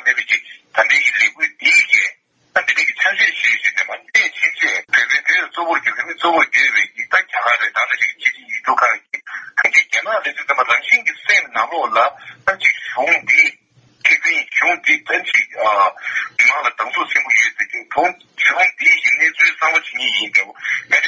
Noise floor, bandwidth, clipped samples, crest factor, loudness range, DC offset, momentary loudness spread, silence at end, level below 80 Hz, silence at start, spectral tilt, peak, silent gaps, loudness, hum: -53 dBFS; 7.8 kHz; under 0.1%; 16 dB; 2 LU; under 0.1%; 8 LU; 0 s; -66 dBFS; 0 s; 0 dB/octave; 0 dBFS; none; -14 LUFS; none